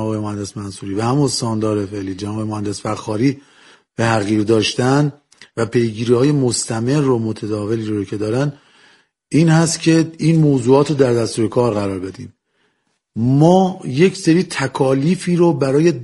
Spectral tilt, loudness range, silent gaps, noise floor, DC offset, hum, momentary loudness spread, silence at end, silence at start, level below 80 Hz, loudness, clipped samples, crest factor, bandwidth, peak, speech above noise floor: -6 dB/octave; 5 LU; none; -66 dBFS; under 0.1%; none; 11 LU; 0 s; 0 s; -54 dBFS; -17 LUFS; under 0.1%; 16 dB; 11.5 kHz; 0 dBFS; 50 dB